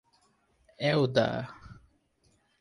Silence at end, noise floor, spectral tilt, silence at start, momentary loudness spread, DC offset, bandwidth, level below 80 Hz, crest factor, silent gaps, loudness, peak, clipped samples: 0.85 s; -70 dBFS; -6.5 dB/octave; 0.8 s; 18 LU; under 0.1%; 11 kHz; -62 dBFS; 22 dB; none; -28 LUFS; -10 dBFS; under 0.1%